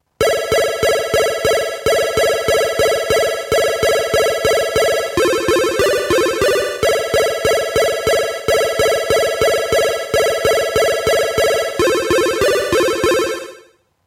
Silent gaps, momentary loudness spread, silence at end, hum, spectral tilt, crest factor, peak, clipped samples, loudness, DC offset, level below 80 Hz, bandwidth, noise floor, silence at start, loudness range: none; 2 LU; 0.45 s; none; -3 dB/octave; 14 dB; 0 dBFS; under 0.1%; -15 LUFS; under 0.1%; -40 dBFS; 17 kHz; -48 dBFS; 0.2 s; 0 LU